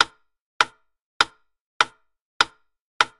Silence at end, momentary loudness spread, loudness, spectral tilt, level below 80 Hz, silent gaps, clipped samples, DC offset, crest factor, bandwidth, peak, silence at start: 0.15 s; 0 LU; -24 LUFS; 0 dB/octave; -60 dBFS; 0.41-0.60 s, 1.02-1.20 s, 1.61-1.80 s, 2.22-2.40 s, 2.81-3.00 s; under 0.1%; under 0.1%; 26 dB; 12 kHz; -2 dBFS; 0 s